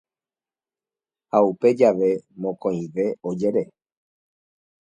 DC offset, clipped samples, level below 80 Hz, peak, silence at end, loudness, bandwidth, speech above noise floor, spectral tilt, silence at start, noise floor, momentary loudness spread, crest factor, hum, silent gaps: under 0.1%; under 0.1%; -68 dBFS; -2 dBFS; 1.25 s; -22 LUFS; 8 kHz; over 69 dB; -8 dB/octave; 1.35 s; under -90 dBFS; 9 LU; 22 dB; none; none